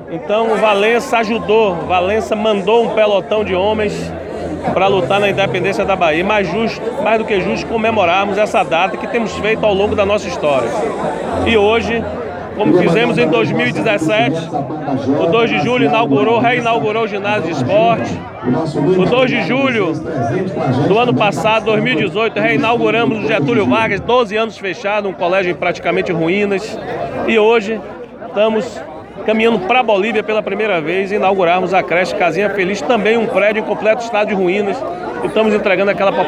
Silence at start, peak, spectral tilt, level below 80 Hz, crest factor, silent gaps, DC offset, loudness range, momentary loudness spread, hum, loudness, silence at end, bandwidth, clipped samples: 0 s; 0 dBFS; -6 dB/octave; -46 dBFS; 14 dB; none; under 0.1%; 2 LU; 7 LU; none; -14 LUFS; 0 s; 12 kHz; under 0.1%